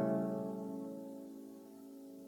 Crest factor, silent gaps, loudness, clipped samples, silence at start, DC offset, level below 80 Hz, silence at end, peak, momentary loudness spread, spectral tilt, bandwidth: 18 dB; none; -43 LUFS; under 0.1%; 0 s; under 0.1%; -86 dBFS; 0 s; -24 dBFS; 16 LU; -8.5 dB/octave; 19 kHz